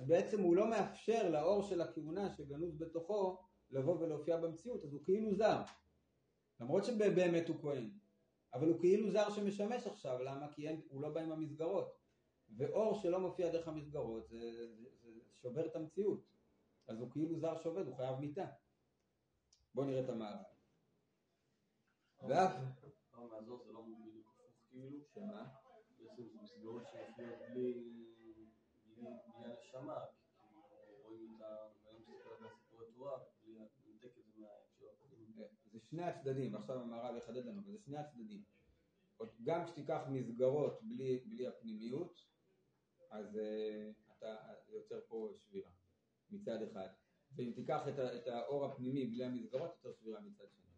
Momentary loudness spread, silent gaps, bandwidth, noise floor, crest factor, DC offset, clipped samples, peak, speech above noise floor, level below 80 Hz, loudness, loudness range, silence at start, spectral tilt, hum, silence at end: 22 LU; none; 9.6 kHz; -83 dBFS; 22 dB; under 0.1%; under 0.1%; -20 dBFS; 42 dB; -78 dBFS; -41 LUFS; 17 LU; 0 s; -7 dB/octave; none; 0.3 s